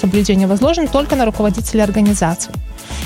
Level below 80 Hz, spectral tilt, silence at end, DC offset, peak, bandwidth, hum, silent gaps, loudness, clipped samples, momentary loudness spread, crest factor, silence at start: -28 dBFS; -5.5 dB/octave; 0 s; under 0.1%; -2 dBFS; 16.5 kHz; none; none; -15 LUFS; under 0.1%; 10 LU; 14 dB; 0 s